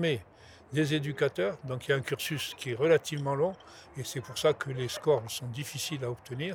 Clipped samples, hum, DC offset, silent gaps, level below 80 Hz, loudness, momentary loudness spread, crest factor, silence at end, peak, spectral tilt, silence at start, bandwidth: under 0.1%; none; under 0.1%; none; -66 dBFS; -31 LUFS; 10 LU; 20 dB; 0 s; -10 dBFS; -5 dB/octave; 0 s; 20 kHz